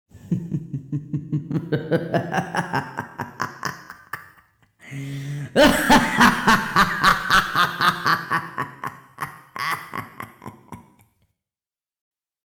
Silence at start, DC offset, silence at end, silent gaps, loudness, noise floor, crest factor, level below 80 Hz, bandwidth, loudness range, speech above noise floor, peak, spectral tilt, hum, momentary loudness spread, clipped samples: 0.15 s; under 0.1%; 1.7 s; none; -21 LUFS; under -90 dBFS; 20 dB; -46 dBFS; over 20 kHz; 15 LU; over 65 dB; -4 dBFS; -4.5 dB/octave; none; 20 LU; under 0.1%